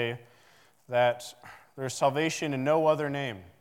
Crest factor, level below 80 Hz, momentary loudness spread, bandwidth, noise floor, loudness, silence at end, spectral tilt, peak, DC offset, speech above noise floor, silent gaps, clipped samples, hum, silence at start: 18 dB; -78 dBFS; 18 LU; 16.5 kHz; -61 dBFS; -28 LUFS; 0.15 s; -5 dB/octave; -12 dBFS; under 0.1%; 33 dB; none; under 0.1%; none; 0 s